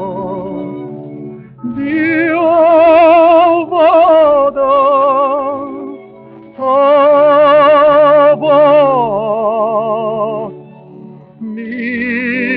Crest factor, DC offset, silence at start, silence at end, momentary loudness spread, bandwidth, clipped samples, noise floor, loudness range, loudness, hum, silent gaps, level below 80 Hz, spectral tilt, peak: 10 dB; under 0.1%; 0 s; 0 s; 19 LU; 4.9 kHz; under 0.1%; -35 dBFS; 5 LU; -10 LUFS; none; none; -50 dBFS; -9 dB/octave; 0 dBFS